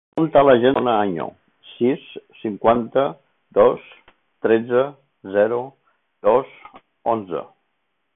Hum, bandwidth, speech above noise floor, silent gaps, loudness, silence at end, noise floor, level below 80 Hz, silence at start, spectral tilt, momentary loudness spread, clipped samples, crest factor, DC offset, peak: none; 3.9 kHz; 55 dB; none; -20 LUFS; 0.7 s; -73 dBFS; -56 dBFS; 0.15 s; -9.5 dB/octave; 15 LU; under 0.1%; 18 dB; under 0.1%; -2 dBFS